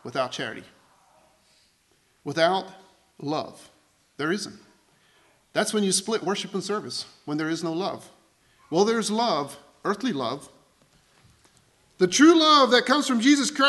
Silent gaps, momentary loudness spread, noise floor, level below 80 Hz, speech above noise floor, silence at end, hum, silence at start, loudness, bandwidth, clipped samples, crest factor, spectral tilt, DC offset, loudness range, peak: none; 18 LU; -65 dBFS; -72 dBFS; 42 dB; 0 s; none; 0.05 s; -23 LUFS; 12.5 kHz; under 0.1%; 20 dB; -3.5 dB/octave; under 0.1%; 9 LU; -4 dBFS